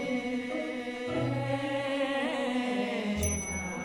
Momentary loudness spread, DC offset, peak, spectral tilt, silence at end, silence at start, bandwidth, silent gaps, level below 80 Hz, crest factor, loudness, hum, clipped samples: 4 LU; under 0.1%; -16 dBFS; -4.5 dB/octave; 0 s; 0 s; 17 kHz; none; -50 dBFS; 16 dB; -32 LUFS; none; under 0.1%